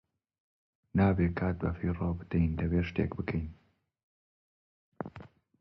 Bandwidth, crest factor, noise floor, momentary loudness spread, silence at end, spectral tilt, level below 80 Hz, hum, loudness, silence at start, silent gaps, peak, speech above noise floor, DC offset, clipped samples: 5.6 kHz; 18 dB; -53 dBFS; 16 LU; 0.35 s; -10.5 dB/octave; -44 dBFS; none; -31 LUFS; 0.95 s; 4.03-4.92 s; -16 dBFS; 23 dB; under 0.1%; under 0.1%